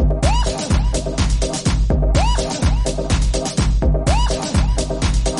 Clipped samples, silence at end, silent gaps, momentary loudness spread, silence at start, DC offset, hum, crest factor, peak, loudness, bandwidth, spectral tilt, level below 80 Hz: under 0.1%; 0 s; none; 3 LU; 0 s; under 0.1%; none; 14 dB; -2 dBFS; -19 LUFS; 11.5 kHz; -5 dB/octave; -18 dBFS